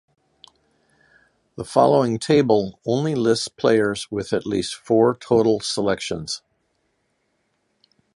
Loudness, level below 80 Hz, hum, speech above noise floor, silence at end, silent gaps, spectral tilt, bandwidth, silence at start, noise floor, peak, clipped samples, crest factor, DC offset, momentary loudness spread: -20 LUFS; -56 dBFS; none; 50 dB; 1.8 s; none; -5.5 dB/octave; 11.5 kHz; 1.6 s; -70 dBFS; -2 dBFS; under 0.1%; 20 dB; under 0.1%; 10 LU